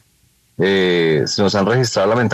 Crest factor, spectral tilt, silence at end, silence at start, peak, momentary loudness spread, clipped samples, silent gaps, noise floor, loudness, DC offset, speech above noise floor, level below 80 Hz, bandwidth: 14 dB; -5 dB/octave; 0 s; 0.6 s; -4 dBFS; 2 LU; under 0.1%; none; -57 dBFS; -16 LUFS; under 0.1%; 42 dB; -54 dBFS; 13 kHz